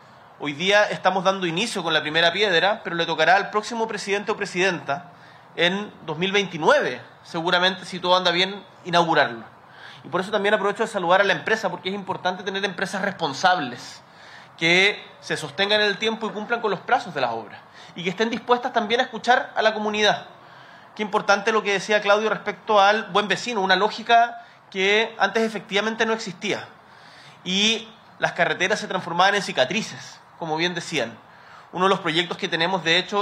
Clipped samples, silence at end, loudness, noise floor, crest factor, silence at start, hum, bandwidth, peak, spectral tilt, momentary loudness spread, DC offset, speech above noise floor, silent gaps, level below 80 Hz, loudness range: under 0.1%; 0 s; -22 LUFS; -47 dBFS; 20 dB; 0.4 s; none; 13.5 kHz; -4 dBFS; -3.5 dB/octave; 12 LU; under 0.1%; 25 dB; none; -68 dBFS; 4 LU